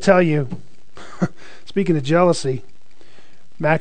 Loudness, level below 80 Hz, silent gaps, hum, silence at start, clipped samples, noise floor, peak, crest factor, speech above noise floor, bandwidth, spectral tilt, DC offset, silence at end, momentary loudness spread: -20 LUFS; -54 dBFS; none; none; 0 s; under 0.1%; -52 dBFS; 0 dBFS; 18 dB; 35 dB; 9.4 kHz; -6.5 dB/octave; 4%; 0 s; 17 LU